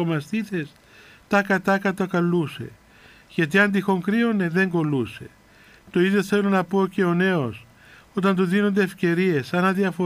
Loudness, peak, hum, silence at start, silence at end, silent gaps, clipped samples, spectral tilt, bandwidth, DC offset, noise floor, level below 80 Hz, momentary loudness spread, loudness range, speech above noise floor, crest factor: -22 LUFS; -6 dBFS; none; 0 s; 0 s; none; under 0.1%; -7 dB/octave; 15.5 kHz; under 0.1%; -51 dBFS; -62 dBFS; 11 LU; 2 LU; 30 dB; 16 dB